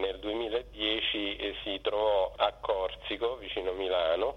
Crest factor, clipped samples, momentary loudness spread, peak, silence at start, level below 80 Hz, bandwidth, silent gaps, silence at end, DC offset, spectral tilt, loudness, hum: 18 dB; under 0.1%; 6 LU; -12 dBFS; 0 s; -52 dBFS; 8.8 kHz; none; 0 s; under 0.1%; -5 dB/octave; -31 LUFS; none